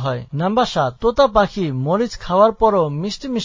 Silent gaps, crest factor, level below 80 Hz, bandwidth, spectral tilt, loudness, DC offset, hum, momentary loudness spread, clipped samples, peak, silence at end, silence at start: none; 16 dB; -40 dBFS; 7.6 kHz; -6.5 dB/octave; -18 LUFS; under 0.1%; none; 8 LU; under 0.1%; 0 dBFS; 0 s; 0 s